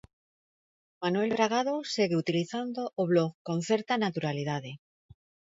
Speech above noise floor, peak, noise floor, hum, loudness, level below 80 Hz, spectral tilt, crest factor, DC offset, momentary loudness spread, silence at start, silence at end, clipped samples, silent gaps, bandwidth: over 61 dB; -10 dBFS; under -90 dBFS; none; -30 LUFS; -72 dBFS; -5.5 dB/octave; 20 dB; under 0.1%; 8 LU; 1 s; 0.8 s; under 0.1%; 3.34-3.45 s; 8 kHz